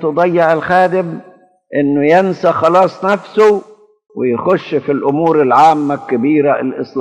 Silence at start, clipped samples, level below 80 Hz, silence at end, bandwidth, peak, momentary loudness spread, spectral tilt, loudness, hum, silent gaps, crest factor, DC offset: 0 s; under 0.1%; -62 dBFS; 0 s; 9.4 kHz; 0 dBFS; 9 LU; -7 dB/octave; -13 LUFS; none; none; 12 dB; under 0.1%